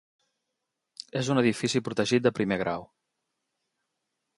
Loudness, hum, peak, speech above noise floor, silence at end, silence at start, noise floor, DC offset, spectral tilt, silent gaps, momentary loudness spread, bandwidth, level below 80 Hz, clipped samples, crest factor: -27 LUFS; none; -8 dBFS; 57 dB; 1.55 s; 1.15 s; -83 dBFS; under 0.1%; -5 dB/octave; none; 12 LU; 11.5 kHz; -64 dBFS; under 0.1%; 22 dB